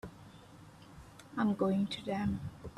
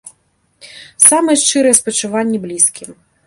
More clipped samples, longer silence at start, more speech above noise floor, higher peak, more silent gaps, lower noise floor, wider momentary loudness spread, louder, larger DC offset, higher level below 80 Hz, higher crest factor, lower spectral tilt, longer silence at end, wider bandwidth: second, under 0.1% vs 0.3%; about the same, 0.05 s vs 0.05 s; second, 21 dB vs 46 dB; second, -20 dBFS vs 0 dBFS; neither; second, -55 dBFS vs -59 dBFS; first, 23 LU vs 10 LU; second, -35 LUFS vs -11 LUFS; neither; about the same, -60 dBFS vs -60 dBFS; about the same, 18 dB vs 16 dB; first, -7 dB/octave vs -2 dB/octave; second, 0 s vs 0.35 s; second, 12.5 kHz vs 16 kHz